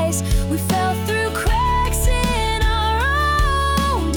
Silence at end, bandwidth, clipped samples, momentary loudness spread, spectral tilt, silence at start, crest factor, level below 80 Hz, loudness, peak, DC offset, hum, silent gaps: 0 s; over 20 kHz; under 0.1%; 3 LU; -4.5 dB/octave; 0 s; 10 dB; -22 dBFS; -19 LUFS; -8 dBFS; under 0.1%; none; none